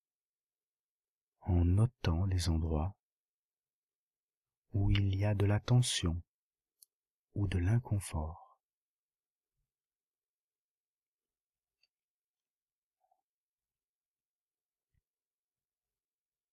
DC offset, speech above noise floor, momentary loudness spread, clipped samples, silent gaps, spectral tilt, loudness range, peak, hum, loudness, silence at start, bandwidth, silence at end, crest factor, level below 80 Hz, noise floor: under 0.1%; over 59 dB; 12 LU; under 0.1%; 2.99-3.64 s, 3.73-3.89 s, 3.95-4.28 s, 4.37-4.41 s, 4.57-4.62 s, 6.29-6.51 s, 6.93-7.03 s, 7.10-7.27 s; -6 dB/octave; 5 LU; -16 dBFS; none; -33 LUFS; 1.45 s; 12.5 kHz; 8.15 s; 22 dB; -52 dBFS; under -90 dBFS